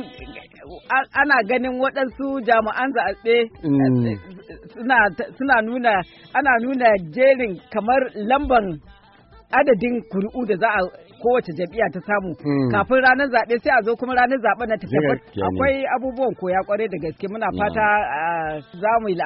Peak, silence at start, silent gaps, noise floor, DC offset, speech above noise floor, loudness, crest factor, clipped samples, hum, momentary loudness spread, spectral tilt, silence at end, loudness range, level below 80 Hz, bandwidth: -4 dBFS; 0 s; none; -49 dBFS; under 0.1%; 30 dB; -20 LUFS; 16 dB; under 0.1%; none; 9 LU; -4 dB/octave; 0 s; 3 LU; -48 dBFS; 5.8 kHz